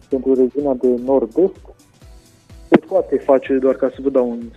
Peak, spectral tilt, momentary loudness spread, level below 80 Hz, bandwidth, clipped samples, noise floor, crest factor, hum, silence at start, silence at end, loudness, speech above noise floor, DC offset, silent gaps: 0 dBFS; -8 dB/octave; 4 LU; -46 dBFS; 8 kHz; under 0.1%; -44 dBFS; 18 dB; none; 0.1 s; 0.05 s; -17 LUFS; 28 dB; under 0.1%; none